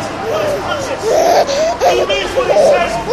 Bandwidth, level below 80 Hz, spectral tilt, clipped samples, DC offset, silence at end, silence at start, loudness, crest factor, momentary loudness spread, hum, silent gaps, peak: 15 kHz; -38 dBFS; -3.5 dB/octave; under 0.1%; 0.3%; 0 s; 0 s; -13 LUFS; 14 dB; 7 LU; none; none; 0 dBFS